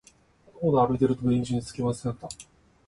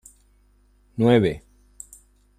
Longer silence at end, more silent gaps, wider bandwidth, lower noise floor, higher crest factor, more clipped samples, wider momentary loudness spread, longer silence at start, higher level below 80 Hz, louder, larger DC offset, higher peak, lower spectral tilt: second, 0.45 s vs 1 s; neither; second, 11.5 kHz vs 14 kHz; about the same, -58 dBFS vs -59 dBFS; about the same, 18 dB vs 20 dB; neither; second, 16 LU vs 25 LU; second, 0.55 s vs 1 s; about the same, -54 dBFS vs -52 dBFS; second, -26 LUFS vs -20 LUFS; neither; second, -8 dBFS vs -4 dBFS; about the same, -7.5 dB/octave vs -7 dB/octave